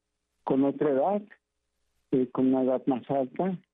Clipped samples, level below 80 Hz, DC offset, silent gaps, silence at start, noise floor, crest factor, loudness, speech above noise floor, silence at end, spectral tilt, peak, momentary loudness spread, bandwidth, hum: under 0.1%; -72 dBFS; under 0.1%; none; 0.45 s; -78 dBFS; 12 dB; -27 LUFS; 51 dB; 0.15 s; -11 dB/octave; -16 dBFS; 6 LU; 3.8 kHz; none